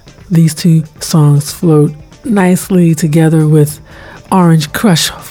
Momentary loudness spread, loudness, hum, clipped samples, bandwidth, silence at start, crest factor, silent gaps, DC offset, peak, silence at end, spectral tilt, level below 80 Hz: 6 LU; -10 LUFS; none; under 0.1%; 17 kHz; 0.05 s; 10 dB; none; under 0.1%; 0 dBFS; 0 s; -6 dB/octave; -42 dBFS